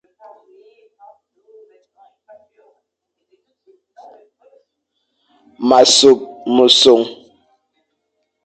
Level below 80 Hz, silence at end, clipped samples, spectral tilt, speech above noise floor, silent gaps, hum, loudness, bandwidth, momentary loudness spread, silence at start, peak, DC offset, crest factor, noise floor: -62 dBFS; 1.3 s; under 0.1%; -2 dB/octave; 65 dB; none; none; -11 LUFS; 9.2 kHz; 11 LU; 5.6 s; 0 dBFS; under 0.1%; 18 dB; -75 dBFS